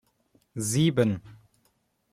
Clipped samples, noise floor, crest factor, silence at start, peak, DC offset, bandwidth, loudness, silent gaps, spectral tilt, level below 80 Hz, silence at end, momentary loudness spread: under 0.1%; -71 dBFS; 18 dB; 0.55 s; -10 dBFS; under 0.1%; 15 kHz; -26 LUFS; none; -5.5 dB/octave; -62 dBFS; 0.8 s; 14 LU